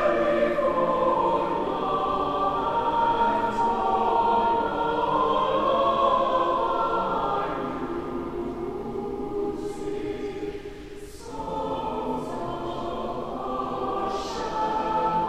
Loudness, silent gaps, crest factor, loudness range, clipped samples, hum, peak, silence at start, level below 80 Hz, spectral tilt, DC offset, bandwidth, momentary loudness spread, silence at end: -26 LUFS; none; 16 dB; 9 LU; under 0.1%; none; -10 dBFS; 0 s; -46 dBFS; -6 dB/octave; 0.4%; 13.5 kHz; 10 LU; 0 s